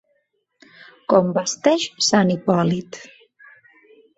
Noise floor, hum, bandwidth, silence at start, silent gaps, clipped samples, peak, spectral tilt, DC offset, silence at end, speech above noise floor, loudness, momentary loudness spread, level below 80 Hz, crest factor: -69 dBFS; none; 8.2 kHz; 1.1 s; none; under 0.1%; -2 dBFS; -4.5 dB/octave; under 0.1%; 1.1 s; 50 dB; -19 LUFS; 18 LU; -62 dBFS; 20 dB